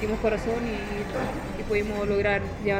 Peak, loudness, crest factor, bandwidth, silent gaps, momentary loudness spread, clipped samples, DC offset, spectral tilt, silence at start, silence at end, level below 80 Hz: -12 dBFS; -27 LUFS; 16 dB; 16 kHz; none; 6 LU; under 0.1%; under 0.1%; -6.5 dB/octave; 0 s; 0 s; -38 dBFS